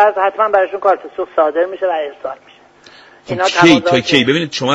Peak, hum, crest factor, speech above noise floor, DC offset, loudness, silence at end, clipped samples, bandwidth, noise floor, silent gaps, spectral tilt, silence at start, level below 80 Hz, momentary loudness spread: 0 dBFS; none; 14 dB; 29 dB; under 0.1%; -14 LUFS; 0 s; under 0.1%; 8.6 kHz; -43 dBFS; none; -4.5 dB/octave; 0 s; -56 dBFS; 15 LU